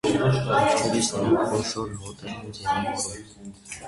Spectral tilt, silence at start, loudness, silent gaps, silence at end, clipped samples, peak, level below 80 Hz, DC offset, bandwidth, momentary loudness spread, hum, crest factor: -4.5 dB/octave; 0.05 s; -24 LUFS; none; 0 s; under 0.1%; -8 dBFS; -50 dBFS; under 0.1%; 11.5 kHz; 17 LU; none; 16 dB